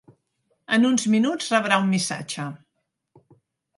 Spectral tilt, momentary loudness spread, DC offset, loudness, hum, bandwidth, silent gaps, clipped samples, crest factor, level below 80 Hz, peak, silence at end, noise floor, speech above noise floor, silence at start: -4 dB/octave; 12 LU; under 0.1%; -22 LUFS; none; 11.5 kHz; none; under 0.1%; 22 dB; -74 dBFS; -2 dBFS; 1.2 s; -72 dBFS; 50 dB; 0.7 s